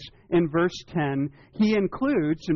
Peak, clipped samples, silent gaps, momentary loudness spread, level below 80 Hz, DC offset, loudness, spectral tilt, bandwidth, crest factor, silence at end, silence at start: -14 dBFS; under 0.1%; none; 6 LU; -54 dBFS; under 0.1%; -25 LUFS; -6 dB/octave; 7.2 kHz; 12 dB; 0 s; 0 s